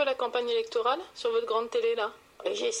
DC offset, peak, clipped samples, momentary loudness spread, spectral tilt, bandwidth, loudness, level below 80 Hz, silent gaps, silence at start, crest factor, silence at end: under 0.1%; -14 dBFS; under 0.1%; 6 LU; -1 dB/octave; 11 kHz; -30 LUFS; -72 dBFS; none; 0 s; 16 dB; 0 s